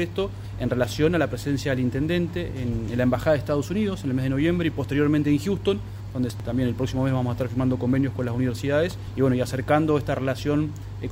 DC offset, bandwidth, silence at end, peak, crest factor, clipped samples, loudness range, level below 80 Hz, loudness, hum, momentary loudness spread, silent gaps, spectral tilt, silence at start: under 0.1%; 16 kHz; 0 s; -8 dBFS; 16 dB; under 0.1%; 1 LU; -42 dBFS; -25 LUFS; none; 6 LU; none; -7 dB/octave; 0 s